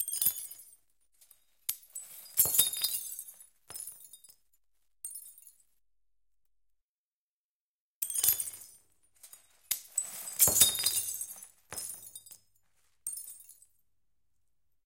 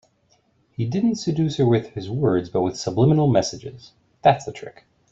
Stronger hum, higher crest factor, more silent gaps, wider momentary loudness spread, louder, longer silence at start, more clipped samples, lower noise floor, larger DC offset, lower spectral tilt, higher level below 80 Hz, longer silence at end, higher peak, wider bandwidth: neither; first, 30 dB vs 20 dB; first, 6.82-8.01 s vs none; first, 23 LU vs 18 LU; second, -29 LUFS vs -21 LUFS; second, 0 s vs 0.8 s; neither; first, under -90 dBFS vs -63 dBFS; neither; second, 0.5 dB/octave vs -7 dB/octave; second, -68 dBFS vs -54 dBFS; first, 1.35 s vs 0.4 s; second, -6 dBFS vs -2 dBFS; first, 17 kHz vs 8 kHz